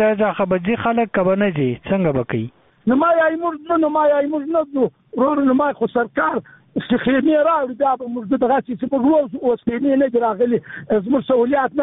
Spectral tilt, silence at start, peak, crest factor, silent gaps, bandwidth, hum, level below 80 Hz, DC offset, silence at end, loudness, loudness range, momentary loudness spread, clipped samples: -5.5 dB/octave; 0 s; -6 dBFS; 12 dB; none; 4 kHz; none; -52 dBFS; under 0.1%; 0 s; -18 LUFS; 1 LU; 7 LU; under 0.1%